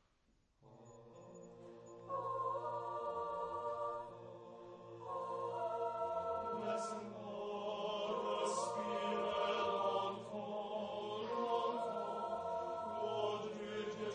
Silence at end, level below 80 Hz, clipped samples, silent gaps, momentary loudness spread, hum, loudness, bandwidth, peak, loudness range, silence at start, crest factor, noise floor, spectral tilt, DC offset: 0 s; -80 dBFS; under 0.1%; none; 17 LU; none; -41 LUFS; 10 kHz; -24 dBFS; 5 LU; 0.6 s; 18 dB; -76 dBFS; -4.5 dB/octave; under 0.1%